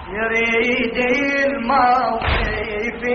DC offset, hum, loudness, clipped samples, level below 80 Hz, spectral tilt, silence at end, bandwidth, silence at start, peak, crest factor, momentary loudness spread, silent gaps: under 0.1%; none; -18 LUFS; under 0.1%; -32 dBFS; -3 dB/octave; 0 s; 6.6 kHz; 0 s; -4 dBFS; 14 dB; 7 LU; none